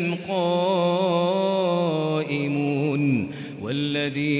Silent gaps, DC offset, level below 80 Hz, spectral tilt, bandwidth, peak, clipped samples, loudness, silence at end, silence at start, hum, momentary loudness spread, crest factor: none; under 0.1%; -62 dBFS; -11 dB/octave; 4 kHz; -10 dBFS; under 0.1%; -23 LUFS; 0 s; 0 s; none; 5 LU; 12 dB